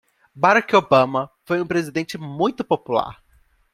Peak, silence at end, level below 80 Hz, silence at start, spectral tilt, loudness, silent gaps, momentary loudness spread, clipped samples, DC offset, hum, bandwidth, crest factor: -2 dBFS; 0.6 s; -58 dBFS; 0.35 s; -5.5 dB/octave; -20 LUFS; none; 11 LU; under 0.1%; under 0.1%; none; 15 kHz; 20 dB